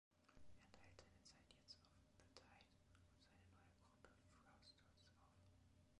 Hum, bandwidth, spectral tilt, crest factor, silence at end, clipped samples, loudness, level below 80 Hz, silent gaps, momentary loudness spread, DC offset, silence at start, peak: none; 11 kHz; -4 dB/octave; 28 dB; 0 s; under 0.1%; -68 LUFS; -80 dBFS; none; 4 LU; under 0.1%; 0.1 s; -42 dBFS